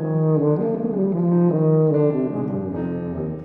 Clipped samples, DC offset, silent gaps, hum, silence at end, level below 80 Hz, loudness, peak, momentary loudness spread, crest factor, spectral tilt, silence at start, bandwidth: under 0.1%; under 0.1%; none; none; 0 s; -52 dBFS; -20 LUFS; -8 dBFS; 9 LU; 12 dB; -13.5 dB/octave; 0 s; 2.8 kHz